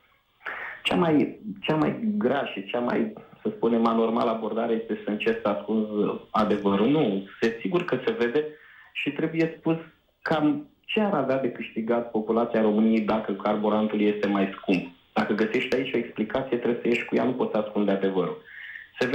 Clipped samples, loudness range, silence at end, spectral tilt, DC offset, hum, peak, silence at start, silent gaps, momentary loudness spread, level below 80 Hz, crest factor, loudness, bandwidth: under 0.1%; 3 LU; 0 s; -7.5 dB/octave; under 0.1%; none; -10 dBFS; 0.45 s; none; 9 LU; -64 dBFS; 14 dB; -26 LUFS; 8.8 kHz